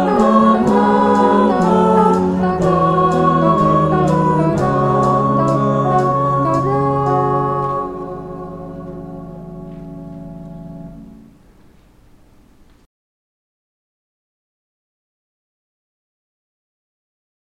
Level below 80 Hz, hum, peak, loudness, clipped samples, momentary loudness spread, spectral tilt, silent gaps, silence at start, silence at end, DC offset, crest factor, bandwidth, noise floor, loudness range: -42 dBFS; none; 0 dBFS; -14 LUFS; under 0.1%; 20 LU; -8.5 dB/octave; none; 0 s; 6.35 s; under 0.1%; 16 dB; 11 kHz; -48 dBFS; 21 LU